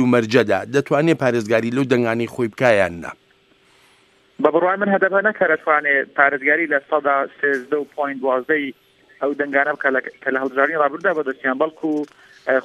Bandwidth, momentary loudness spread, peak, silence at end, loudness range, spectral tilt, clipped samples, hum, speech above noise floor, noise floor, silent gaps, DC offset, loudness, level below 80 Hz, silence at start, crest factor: 13.5 kHz; 8 LU; 0 dBFS; 0 s; 4 LU; -6 dB/octave; under 0.1%; none; 38 dB; -56 dBFS; none; under 0.1%; -19 LUFS; -64 dBFS; 0 s; 18 dB